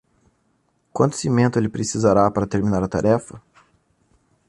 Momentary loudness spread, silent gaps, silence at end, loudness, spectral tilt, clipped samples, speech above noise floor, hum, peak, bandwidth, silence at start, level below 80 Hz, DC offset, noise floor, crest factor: 6 LU; none; 1.1 s; -20 LUFS; -6.5 dB/octave; under 0.1%; 47 dB; none; -2 dBFS; 11.5 kHz; 0.95 s; -46 dBFS; under 0.1%; -66 dBFS; 18 dB